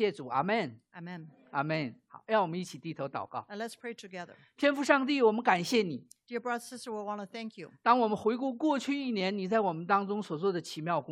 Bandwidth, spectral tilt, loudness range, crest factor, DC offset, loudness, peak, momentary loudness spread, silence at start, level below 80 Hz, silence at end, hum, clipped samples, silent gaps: 14.5 kHz; -5.5 dB/octave; 5 LU; 22 dB; under 0.1%; -31 LUFS; -8 dBFS; 17 LU; 0 s; -80 dBFS; 0 s; none; under 0.1%; none